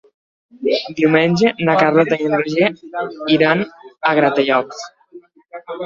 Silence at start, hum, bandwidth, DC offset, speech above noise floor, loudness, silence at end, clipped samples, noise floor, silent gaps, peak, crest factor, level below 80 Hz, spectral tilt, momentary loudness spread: 0.6 s; none; 7.4 kHz; under 0.1%; 27 dB; -16 LUFS; 0 s; under 0.1%; -43 dBFS; none; -2 dBFS; 16 dB; -60 dBFS; -6 dB/octave; 15 LU